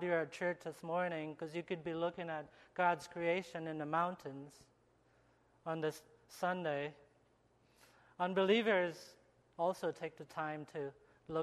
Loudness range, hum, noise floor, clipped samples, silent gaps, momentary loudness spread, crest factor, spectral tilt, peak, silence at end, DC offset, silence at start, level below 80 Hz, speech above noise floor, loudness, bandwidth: 6 LU; none; -72 dBFS; under 0.1%; none; 14 LU; 22 dB; -5.5 dB/octave; -18 dBFS; 0 s; under 0.1%; 0 s; -80 dBFS; 33 dB; -39 LUFS; 13 kHz